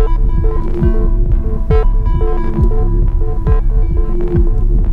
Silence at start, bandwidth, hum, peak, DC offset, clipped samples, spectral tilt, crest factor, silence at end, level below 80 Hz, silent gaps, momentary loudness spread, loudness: 0 s; 3 kHz; none; 0 dBFS; under 0.1%; under 0.1%; -10.5 dB/octave; 10 dB; 0 s; -12 dBFS; none; 3 LU; -16 LUFS